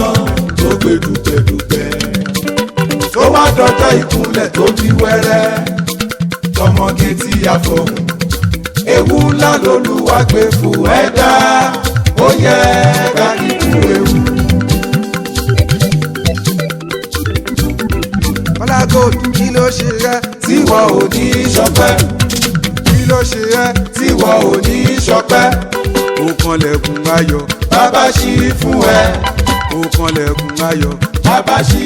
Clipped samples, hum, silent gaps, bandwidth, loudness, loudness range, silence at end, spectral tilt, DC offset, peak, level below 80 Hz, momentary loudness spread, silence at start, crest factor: under 0.1%; none; none; 19.5 kHz; -11 LUFS; 4 LU; 0 s; -5 dB/octave; under 0.1%; 0 dBFS; -24 dBFS; 7 LU; 0 s; 10 dB